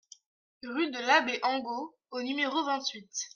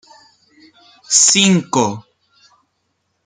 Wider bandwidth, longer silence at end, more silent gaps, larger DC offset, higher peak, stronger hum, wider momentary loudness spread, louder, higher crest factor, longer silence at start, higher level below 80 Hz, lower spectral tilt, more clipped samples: about the same, 10.5 kHz vs 10 kHz; second, 0.1 s vs 1.25 s; neither; neither; second, -10 dBFS vs 0 dBFS; neither; about the same, 13 LU vs 12 LU; second, -30 LUFS vs -12 LUFS; about the same, 22 dB vs 18 dB; second, 0.65 s vs 1.1 s; second, -84 dBFS vs -60 dBFS; second, -1 dB/octave vs -2.5 dB/octave; neither